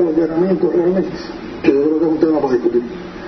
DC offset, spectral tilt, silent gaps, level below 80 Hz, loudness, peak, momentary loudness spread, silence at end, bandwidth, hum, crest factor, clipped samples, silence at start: under 0.1%; -8.5 dB/octave; none; -46 dBFS; -16 LUFS; 0 dBFS; 10 LU; 0 s; 6.2 kHz; none; 16 dB; under 0.1%; 0 s